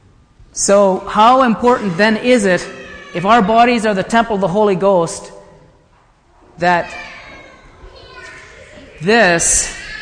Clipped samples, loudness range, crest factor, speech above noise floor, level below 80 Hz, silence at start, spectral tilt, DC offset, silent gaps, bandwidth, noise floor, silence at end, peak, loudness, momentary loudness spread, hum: under 0.1%; 11 LU; 14 dB; 38 dB; -42 dBFS; 0.55 s; -3.5 dB/octave; under 0.1%; none; 10.5 kHz; -51 dBFS; 0 s; 0 dBFS; -13 LUFS; 19 LU; none